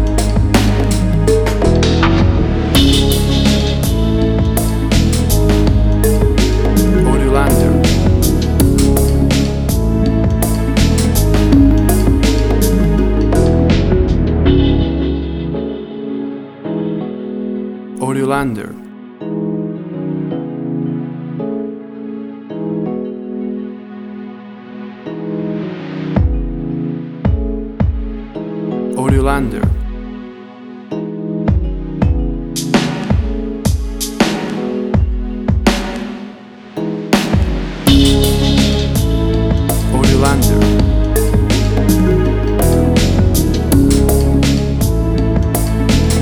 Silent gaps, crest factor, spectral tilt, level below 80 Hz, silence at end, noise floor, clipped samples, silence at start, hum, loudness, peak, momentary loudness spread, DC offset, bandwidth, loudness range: none; 14 dB; -6 dB/octave; -18 dBFS; 0 s; -33 dBFS; under 0.1%; 0 s; none; -14 LUFS; 0 dBFS; 13 LU; under 0.1%; 19 kHz; 9 LU